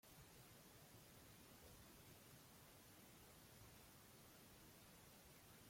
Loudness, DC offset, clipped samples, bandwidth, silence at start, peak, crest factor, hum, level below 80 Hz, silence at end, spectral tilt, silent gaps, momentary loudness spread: -65 LUFS; under 0.1%; under 0.1%; 16.5 kHz; 0.05 s; -52 dBFS; 14 dB; none; -78 dBFS; 0 s; -3.5 dB/octave; none; 1 LU